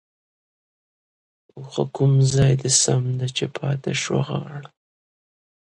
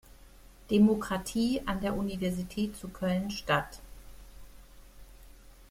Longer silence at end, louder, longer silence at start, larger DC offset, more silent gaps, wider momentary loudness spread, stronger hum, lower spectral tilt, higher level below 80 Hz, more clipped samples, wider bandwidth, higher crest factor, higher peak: first, 0.95 s vs 0.05 s; first, -21 LUFS vs -30 LUFS; first, 1.55 s vs 0.1 s; neither; neither; first, 14 LU vs 10 LU; neither; second, -4.5 dB/octave vs -6 dB/octave; about the same, -52 dBFS vs -50 dBFS; neither; second, 11.5 kHz vs 16 kHz; about the same, 22 dB vs 20 dB; first, -2 dBFS vs -12 dBFS